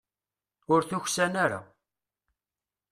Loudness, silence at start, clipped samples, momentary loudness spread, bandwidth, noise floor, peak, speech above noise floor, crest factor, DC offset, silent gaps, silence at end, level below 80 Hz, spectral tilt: -27 LUFS; 0.7 s; under 0.1%; 4 LU; 14.5 kHz; under -90 dBFS; -10 dBFS; over 63 dB; 22 dB; under 0.1%; none; 1.25 s; -70 dBFS; -4 dB/octave